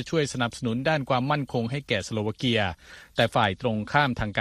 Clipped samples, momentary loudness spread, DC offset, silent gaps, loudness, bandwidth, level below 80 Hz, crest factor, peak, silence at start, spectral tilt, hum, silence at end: under 0.1%; 6 LU; under 0.1%; none; -26 LUFS; 13.5 kHz; -50 dBFS; 20 dB; -6 dBFS; 0 s; -5.5 dB/octave; none; 0 s